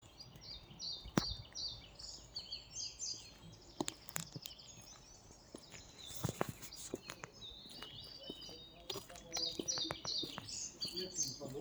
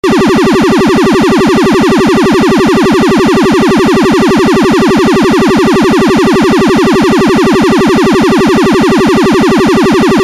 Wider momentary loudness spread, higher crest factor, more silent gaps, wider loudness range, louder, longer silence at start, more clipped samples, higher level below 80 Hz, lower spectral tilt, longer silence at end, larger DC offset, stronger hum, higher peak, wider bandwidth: first, 16 LU vs 0 LU; first, 32 dB vs 4 dB; neither; first, 6 LU vs 0 LU; second, -44 LUFS vs -7 LUFS; about the same, 0 s vs 0.05 s; neither; second, -64 dBFS vs -30 dBFS; second, -2.5 dB/octave vs -5.5 dB/octave; about the same, 0 s vs 0 s; second, under 0.1% vs 0.7%; neither; second, -14 dBFS vs -4 dBFS; first, over 20 kHz vs 14.5 kHz